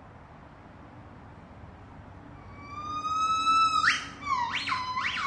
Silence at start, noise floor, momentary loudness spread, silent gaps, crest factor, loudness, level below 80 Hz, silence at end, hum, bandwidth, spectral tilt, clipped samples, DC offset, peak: 0 s; -49 dBFS; 26 LU; none; 20 dB; -27 LUFS; -58 dBFS; 0 s; none; 11 kHz; -2 dB/octave; under 0.1%; under 0.1%; -12 dBFS